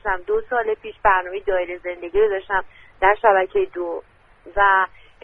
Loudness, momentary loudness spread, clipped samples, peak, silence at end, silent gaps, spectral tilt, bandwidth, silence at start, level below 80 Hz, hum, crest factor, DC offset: -20 LUFS; 12 LU; under 0.1%; -2 dBFS; 0.4 s; none; -6.5 dB/octave; 3.9 kHz; 0.05 s; -44 dBFS; none; 20 dB; under 0.1%